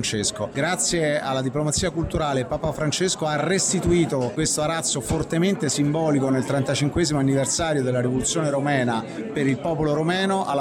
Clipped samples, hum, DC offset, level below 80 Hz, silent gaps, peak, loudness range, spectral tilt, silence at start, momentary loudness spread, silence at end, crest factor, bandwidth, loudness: under 0.1%; none; under 0.1%; -44 dBFS; none; -10 dBFS; 1 LU; -4.5 dB/octave; 0 s; 4 LU; 0 s; 12 dB; 16.5 kHz; -22 LUFS